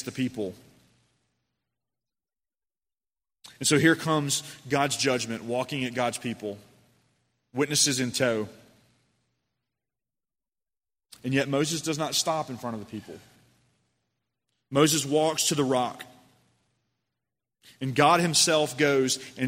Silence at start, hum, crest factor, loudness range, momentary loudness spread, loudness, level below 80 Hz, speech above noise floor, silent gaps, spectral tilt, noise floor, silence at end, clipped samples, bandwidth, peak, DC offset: 0 s; none; 24 dB; 7 LU; 16 LU; -25 LUFS; -70 dBFS; over 64 dB; none; -3.5 dB/octave; under -90 dBFS; 0 s; under 0.1%; 16 kHz; -6 dBFS; under 0.1%